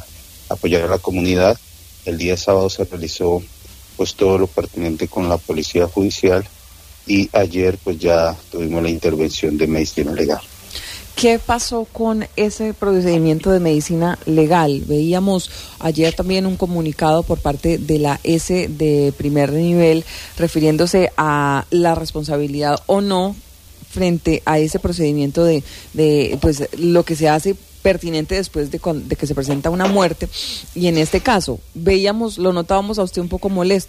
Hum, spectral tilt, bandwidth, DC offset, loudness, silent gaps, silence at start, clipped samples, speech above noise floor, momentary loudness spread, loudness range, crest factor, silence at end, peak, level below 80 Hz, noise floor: none; -5.5 dB/octave; 15.5 kHz; under 0.1%; -17 LUFS; none; 0 s; under 0.1%; 25 dB; 8 LU; 3 LU; 16 dB; 0 s; -2 dBFS; -36 dBFS; -41 dBFS